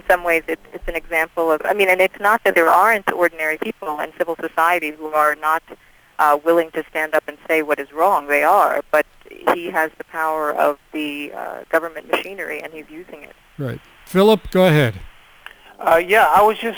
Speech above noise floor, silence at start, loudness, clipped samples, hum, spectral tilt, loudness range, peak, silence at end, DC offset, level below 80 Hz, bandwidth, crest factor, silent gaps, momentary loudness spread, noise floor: 25 dB; 0.05 s; -18 LUFS; under 0.1%; none; -5 dB/octave; 6 LU; -2 dBFS; 0 s; under 0.1%; -46 dBFS; over 20 kHz; 16 dB; none; 14 LU; -43 dBFS